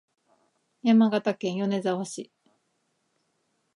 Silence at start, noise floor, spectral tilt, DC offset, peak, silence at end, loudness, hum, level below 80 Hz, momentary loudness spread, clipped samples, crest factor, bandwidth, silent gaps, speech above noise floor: 0.85 s; -74 dBFS; -6 dB/octave; under 0.1%; -10 dBFS; 1.55 s; -25 LUFS; none; -82 dBFS; 17 LU; under 0.1%; 18 dB; 11 kHz; none; 50 dB